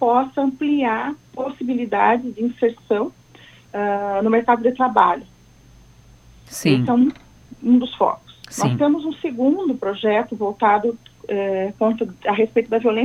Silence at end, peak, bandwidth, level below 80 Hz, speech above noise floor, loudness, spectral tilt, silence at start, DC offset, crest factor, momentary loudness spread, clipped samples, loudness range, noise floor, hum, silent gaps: 0 s; 0 dBFS; 14 kHz; -56 dBFS; 30 dB; -20 LUFS; -6 dB/octave; 0 s; under 0.1%; 20 dB; 10 LU; under 0.1%; 2 LU; -48 dBFS; none; none